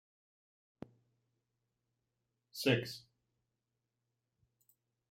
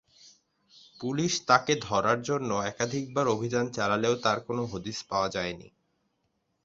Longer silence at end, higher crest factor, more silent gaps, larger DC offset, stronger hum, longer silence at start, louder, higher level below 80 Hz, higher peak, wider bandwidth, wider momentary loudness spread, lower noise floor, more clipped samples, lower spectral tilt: first, 2.1 s vs 0.95 s; about the same, 26 dB vs 24 dB; neither; neither; neither; first, 2.55 s vs 0.25 s; second, -35 LUFS vs -28 LUFS; second, -82 dBFS vs -62 dBFS; second, -18 dBFS vs -6 dBFS; first, 16 kHz vs 7.8 kHz; first, 23 LU vs 10 LU; first, -88 dBFS vs -76 dBFS; neither; about the same, -5 dB/octave vs -4 dB/octave